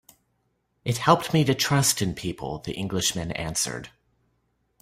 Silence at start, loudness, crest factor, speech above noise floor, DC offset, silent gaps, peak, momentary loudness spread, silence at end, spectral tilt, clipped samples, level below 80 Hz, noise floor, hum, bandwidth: 0.85 s; -24 LUFS; 24 dB; 48 dB; under 0.1%; none; -4 dBFS; 12 LU; 0.95 s; -4 dB/octave; under 0.1%; -52 dBFS; -72 dBFS; none; 16 kHz